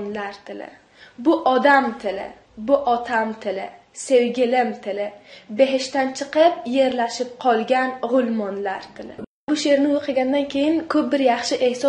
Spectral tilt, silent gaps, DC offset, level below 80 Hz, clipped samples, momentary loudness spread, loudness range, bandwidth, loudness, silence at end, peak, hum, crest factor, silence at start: -4 dB/octave; 9.27-9.47 s; under 0.1%; -62 dBFS; under 0.1%; 15 LU; 2 LU; 10.5 kHz; -20 LUFS; 0 s; -2 dBFS; none; 20 dB; 0 s